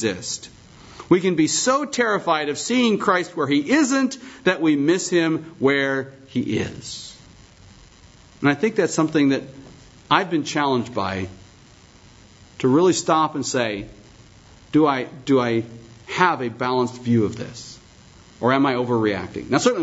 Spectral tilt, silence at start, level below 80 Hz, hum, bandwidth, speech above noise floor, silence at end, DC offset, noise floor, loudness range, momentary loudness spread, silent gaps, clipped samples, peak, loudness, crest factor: -4.5 dB/octave; 0 s; -56 dBFS; none; 8 kHz; 29 dB; 0 s; under 0.1%; -49 dBFS; 4 LU; 13 LU; none; under 0.1%; -2 dBFS; -21 LUFS; 20 dB